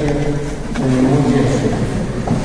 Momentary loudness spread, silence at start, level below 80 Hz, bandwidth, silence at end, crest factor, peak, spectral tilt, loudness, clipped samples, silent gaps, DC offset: 7 LU; 0 s; -28 dBFS; 10.5 kHz; 0 s; 14 dB; -2 dBFS; -7 dB/octave; -17 LUFS; under 0.1%; none; under 0.1%